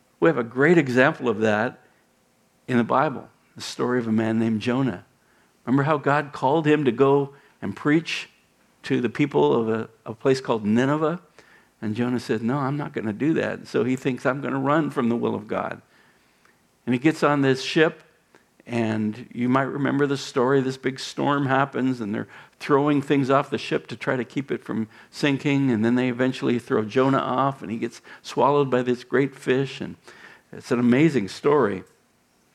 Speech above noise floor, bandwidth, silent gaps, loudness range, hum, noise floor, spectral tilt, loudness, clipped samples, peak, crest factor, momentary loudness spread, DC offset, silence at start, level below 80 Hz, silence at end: 40 dB; 12.5 kHz; none; 3 LU; none; -63 dBFS; -6.5 dB/octave; -23 LUFS; under 0.1%; -2 dBFS; 20 dB; 12 LU; under 0.1%; 0.2 s; -70 dBFS; 0.7 s